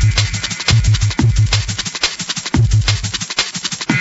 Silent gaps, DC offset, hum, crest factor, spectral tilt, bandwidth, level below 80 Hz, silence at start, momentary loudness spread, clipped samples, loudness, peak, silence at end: none; under 0.1%; none; 16 dB; -3.5 dB/octave; 8 kHz; -24 dBFS; 0 s; 5 LU; under 0.1%; -16 LUFS; 0 dBFS; 0 s